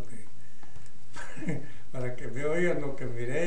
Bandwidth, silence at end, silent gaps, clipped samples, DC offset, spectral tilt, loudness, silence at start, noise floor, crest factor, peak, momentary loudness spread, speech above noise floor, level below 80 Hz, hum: 10 kHz; 0 s; none; under 0.1%; 6%; -6.5 dB/octave; -34 LUFS; 0 s; -53 dBFS; 16 dB; -14 dBFS; 25 LU; 23 dB; -54 dBFS; none